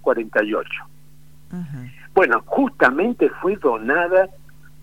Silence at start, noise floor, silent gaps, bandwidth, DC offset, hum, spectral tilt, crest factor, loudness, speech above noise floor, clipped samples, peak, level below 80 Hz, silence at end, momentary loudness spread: 0.05 s; -50 dBFS; none; 16 kHz; 0.8%; none; -7 dB/octave; 20 dB; -19 LUFS; 30 dB; under 0.1%; 0 dBFS; -54 dBFS; 0.55 s; 16 LU